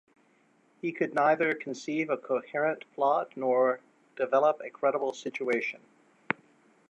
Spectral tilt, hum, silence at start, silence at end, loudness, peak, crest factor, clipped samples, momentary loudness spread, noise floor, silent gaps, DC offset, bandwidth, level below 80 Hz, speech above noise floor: -5.5 dB/octave; none; 0.85 s; 0.6 s; -29 LUFS; -6 dBFS; 24 dB; under 0.1%; 10 LU; -66 dBFS; none; under 0.1%; 8.4 kHz; -86 dBFS; 38 dB